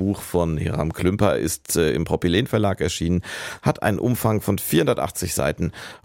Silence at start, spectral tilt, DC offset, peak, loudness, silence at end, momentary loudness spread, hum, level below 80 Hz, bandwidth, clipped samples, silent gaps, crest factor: 0 s; -5.5 dB/octave; under 0.1%; -4 dBFS; -22 LUFS; 0.1 s; 5 LU; none; -40 dBFS; 17 kHz; under 0.1%; none; 18 dB